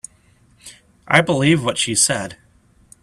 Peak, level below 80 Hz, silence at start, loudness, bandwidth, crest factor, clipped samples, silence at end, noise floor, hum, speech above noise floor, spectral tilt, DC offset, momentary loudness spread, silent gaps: 0 dBFS; -54 dBFS; 0.65 s; -16 LUFS; 14 kHz; 20 dB; under 0.1%; 0.7 s; -54 dBFS; none; 37 dB; -3.5 dB/octave; under 0.1%; 14 LU; none